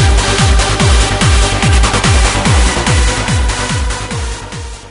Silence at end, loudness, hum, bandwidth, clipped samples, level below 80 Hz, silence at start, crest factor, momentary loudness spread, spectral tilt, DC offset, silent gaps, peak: 0 s; -12 LUFS; none; 11 kHz; under 0.1%; -14 dBFS; 0 s; 10 dB; 10 LU; -4 dB/octave; under 0.1%; none; 0 dBFS